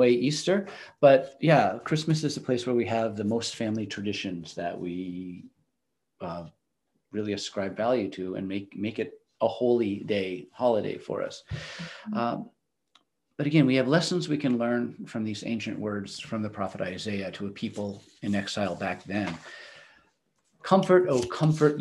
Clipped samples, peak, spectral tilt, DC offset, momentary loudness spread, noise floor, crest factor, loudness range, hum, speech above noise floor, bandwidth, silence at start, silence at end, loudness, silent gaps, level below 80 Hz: under 0.1%; -6 dBFS; -6 dB/octave; under 0.1%; 16 LU; -82 dBFS; 22 dB; 9 LU; none; 55 dB; 12 kHz; 0 s; 0 s; -28 LUFS; none; -64 dBFS